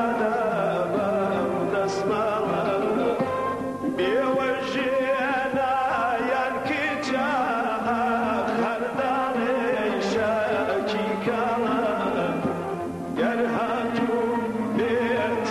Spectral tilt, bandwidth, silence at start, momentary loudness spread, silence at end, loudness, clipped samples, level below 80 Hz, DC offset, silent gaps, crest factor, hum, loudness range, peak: -6 dB/octave; 13.5 kHz; 0 s; 3 LU; 0 s; -25 LUFS; under 0.1%; -58 dBFS; under 0.1%; none; 12 dB; none; 1 LU; -12 dBFS